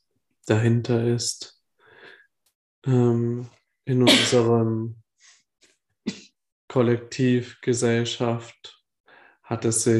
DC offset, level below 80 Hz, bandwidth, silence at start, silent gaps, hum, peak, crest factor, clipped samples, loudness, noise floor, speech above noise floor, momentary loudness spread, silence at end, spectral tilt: under 0.1%; -66 dBFS; 12.5 kHz; 0.45 s; 2.55-2.82 s, 6.52-6.68 s, 9.00-9.04 s; none; -4 dBFS; 20 dB; under 0.1%; -22 LUFS; -58 dBFS; 37 dB; 18 LU; 0 s; -5 dB/octave